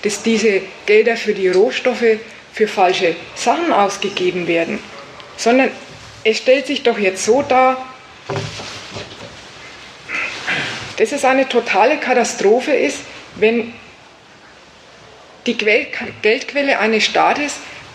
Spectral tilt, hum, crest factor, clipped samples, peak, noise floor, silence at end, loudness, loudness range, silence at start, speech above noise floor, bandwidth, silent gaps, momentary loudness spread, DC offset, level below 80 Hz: -3.5 dB/octave; none; 16 dB; under 0.1%; 0 dBFS; -43 dBFS; 0 s; -16 LUFS; 5 LU; 0 s; 28 dB; 12.5 kHz; none; 17 LU; under 0.1%; -56 dBFS